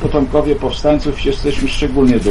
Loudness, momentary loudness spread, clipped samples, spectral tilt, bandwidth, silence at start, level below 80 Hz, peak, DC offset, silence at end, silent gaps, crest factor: -15 LUFS; 5 LU; under 0.1%; -6.5 dB/octave; 11.5 kHz; 0 s; -22 dBFS; -2 dBFS; under 0.1%; 0 s; none; 12 dB